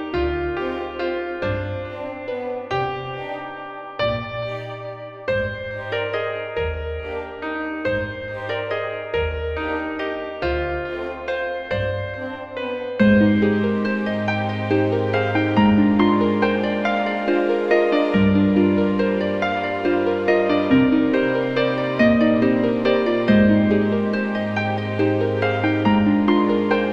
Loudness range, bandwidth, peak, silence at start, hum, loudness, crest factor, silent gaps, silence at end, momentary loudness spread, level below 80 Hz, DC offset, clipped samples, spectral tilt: 8 LU; 6.8 kHz; -4 dBFS; 0 s; none; -21 LUFS; 16 dB; none; 0 s; 12 LU; -42 dBFS; 0.2%; under 0.1%; -8 dB/octave